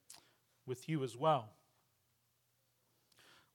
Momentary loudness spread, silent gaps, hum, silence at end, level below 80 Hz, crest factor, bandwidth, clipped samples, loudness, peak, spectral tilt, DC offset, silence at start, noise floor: 24 LU; none; none; 2.05 s; under -90 dBFS; 22 dB; 18 kHz; under 0.1%; -38 LUFS; -20 dBFS; -6 dB/octave; under 0.1%; 0.1 s; -79 dBFS